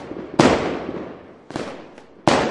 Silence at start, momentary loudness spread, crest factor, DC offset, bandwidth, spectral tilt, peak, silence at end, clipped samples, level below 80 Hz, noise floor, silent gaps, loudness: 0 s; 20 LU; 22 dB; under 0.1%; 11.5 kHz; -5 dB/octave; 0 dBFS; 0 s; under 0.1%; -48 dBFS; -42 dBFS; none; -21 LUFS